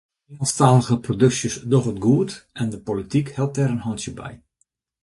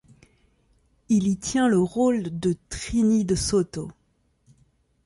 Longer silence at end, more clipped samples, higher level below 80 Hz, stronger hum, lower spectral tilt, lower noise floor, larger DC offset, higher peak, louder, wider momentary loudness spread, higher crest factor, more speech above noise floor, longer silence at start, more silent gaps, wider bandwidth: second, 0.65 s vs 1.15 s; neither; second, -52 dBFS vs -46 dBFS; neither; about the same, -6 dB/octave vs -5.5 dB/octave; about the same, -69 dBFS vs -67 dBFS; neither; first, -2 dBFS vs -10 dBFS; about the same, -21 LUFS vs -23 LUFS; about the same, 12 LU vs 10 LU; first, 20 dB vs 14 dB; first, 49 dB vs 45 dB; second, 0.3 s vs 1.1 s; neither; about the same, 11.5 kHz vs 11.5 kHz